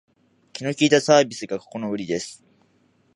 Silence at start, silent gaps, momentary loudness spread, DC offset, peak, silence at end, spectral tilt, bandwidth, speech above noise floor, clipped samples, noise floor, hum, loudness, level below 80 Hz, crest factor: 0.55 s; none; 15 LU; under 0.1%; -2 dBFS; 0.8 s; -4 dB/octave; 11.5 kHz; 41 dB; under 0.1%; -62 dBFS; none; -21 LUFS; -68 dBFS; 22 dB